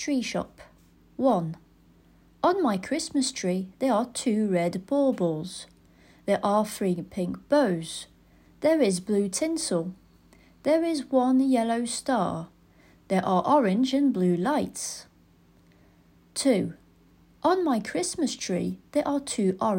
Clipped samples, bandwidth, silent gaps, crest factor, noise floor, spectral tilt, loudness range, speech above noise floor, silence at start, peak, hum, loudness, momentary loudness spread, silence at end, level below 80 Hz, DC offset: under 0.1%; 16 kHz; none; 18 dB; -59 dBFS; -5 dB/octave; 3 LU; 34 dB; 0 s; -8 dBFS; none; -26 LUFS; 12 LU; 0 s; -62 dBFS; under 0.1%